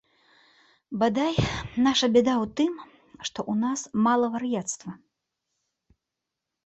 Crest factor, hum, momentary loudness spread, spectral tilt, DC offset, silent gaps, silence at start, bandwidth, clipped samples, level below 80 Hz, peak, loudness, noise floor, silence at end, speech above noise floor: 18 dB; none; 15 LU; -4.5 dB/octave; under 0.1%; none; 0.9 s; 8.4 kHz; under 0.1%; -52 dBFS; -8 dBFS; -25 LUFS; -86 dBFS; 1.7 s; 61 dB